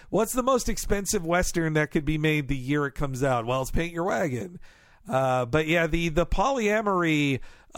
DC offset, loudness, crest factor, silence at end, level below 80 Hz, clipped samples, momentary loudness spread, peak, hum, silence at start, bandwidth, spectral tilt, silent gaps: under 0.1%; -26 LUFS; 18 dB; 0 s; -36 dBFS; under 0.1%; 5 LU; -8 dBFS; none; 0.05 s; 17 kHz; -5 dB/octave; none